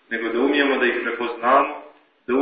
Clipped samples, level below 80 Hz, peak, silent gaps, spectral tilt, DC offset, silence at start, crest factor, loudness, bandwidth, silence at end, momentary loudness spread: under 0.1%; -64 dBFS; -4 dBFS; none; -8 dB/octave; under 0.1%; 0.1 s; 18 dB; -20 LUFS; 5 kHz; 0 s; 10 LU